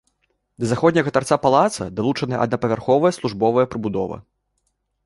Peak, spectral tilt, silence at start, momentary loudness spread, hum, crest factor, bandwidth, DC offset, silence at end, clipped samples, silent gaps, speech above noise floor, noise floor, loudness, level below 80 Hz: -2 dBFS; -6 dB/octave; 0.6 s; 8 LU; none; 18 dB; 11.5 kHz; under 0.1%; 0.85 s; under 0.1%; none; 52 dB; -71 dBFS; -20 LUFS; -52 dBFS